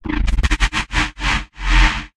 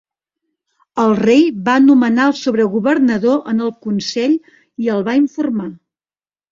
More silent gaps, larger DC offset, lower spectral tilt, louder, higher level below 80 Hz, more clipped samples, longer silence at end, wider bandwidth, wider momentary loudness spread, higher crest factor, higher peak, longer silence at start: neither; neither; second, -3.5 dB/octave vs -6 dB/octave; second, -19 LUFS vs -15 LUFS; first, -18 dBFS vs -58 dBFS; neither; second, 0.1 s vs 0.75 s; first, 10.5 kHz vs 7.6 kHz; second, 5 LU vs 10 LU; about the same, 16 dB vs 14 dB; about the same, -2 dBFS vs 0 dBFS; second, 0.05 s vs 0.95 s